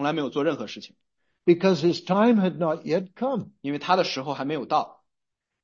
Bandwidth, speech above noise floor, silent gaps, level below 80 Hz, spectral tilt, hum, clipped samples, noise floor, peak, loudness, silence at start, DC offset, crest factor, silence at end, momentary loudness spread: 7.4 kHz; 59 dB; none; -74 dBFS; -6.5 dB/octave; none; under 0.1%; -83 dBFS; -8 dBFS; -24 LUFS; 0 s; under 0.1%; 18 dB; 0.75 s; 11 LU